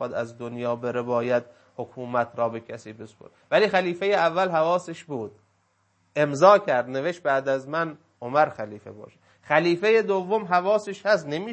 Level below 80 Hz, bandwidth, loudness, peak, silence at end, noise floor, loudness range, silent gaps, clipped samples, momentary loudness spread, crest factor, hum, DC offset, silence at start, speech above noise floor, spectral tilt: -74 dBFS; 8.6 kHz; -24 LUFS; -2 dBFS; 0 s; -68 dBFS; 4 LU; none; under 0.1%; 17 LU; 22 dB; none; under 0.1%; 0 s; 44 dB; -5.5 dB/octave